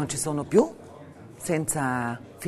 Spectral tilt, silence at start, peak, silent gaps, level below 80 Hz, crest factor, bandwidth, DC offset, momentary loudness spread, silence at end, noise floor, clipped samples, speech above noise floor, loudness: -5 dB/octave; 0 s; -8 dBFS; none; -58 dBFS; 20 dB; 13.5 kHz; under 0.1%; 23 LU; 0 s; -45 dBFS; under 0.1%; 20 dB; -26 LUFS